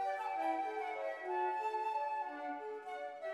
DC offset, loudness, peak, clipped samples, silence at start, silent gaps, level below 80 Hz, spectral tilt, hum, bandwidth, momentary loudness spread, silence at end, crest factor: under 0.1%; -40 LUFS; -26 dBFS; under 0.1%; 0 s; none; under -90 dBFS; -3 dB/octave; none; 12.5 kHz; 7 LU; 0 s; 14 dB